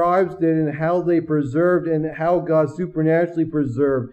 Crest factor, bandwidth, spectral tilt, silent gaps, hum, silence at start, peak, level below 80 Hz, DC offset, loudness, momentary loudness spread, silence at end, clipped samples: 12 dB; 8.4 kHz; -9.5 dB/octave; none; none; 0 s; -6 dBFS; -52 dBFS; under 0.1%; -20 LUFS; 4 LU; 0 s; under 0.1%